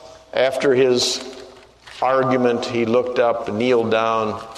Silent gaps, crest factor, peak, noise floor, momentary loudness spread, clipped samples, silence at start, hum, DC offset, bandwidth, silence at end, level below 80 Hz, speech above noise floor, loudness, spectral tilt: none; 16 dB; -2 dBFS; -43 dBFS; 8 LU; under 0.1%; 0.05 s; none; under 0.1%; 13.5 kHz; 0 s; -58 dBFS; 25 dB; -19 LUFS; -4 dB/octave